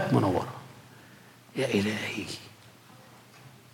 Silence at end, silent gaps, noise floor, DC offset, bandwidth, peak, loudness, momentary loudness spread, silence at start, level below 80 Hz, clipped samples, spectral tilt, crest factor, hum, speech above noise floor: 0.25 s; none; -53 dBFS; under 0.1%; 18 kHz; -10 dBFS; -30 LUFS; 26 LU; 0 s; -72 dBFS; under 0.1%; -6 dB/octave; 22 dB; none; 25 dB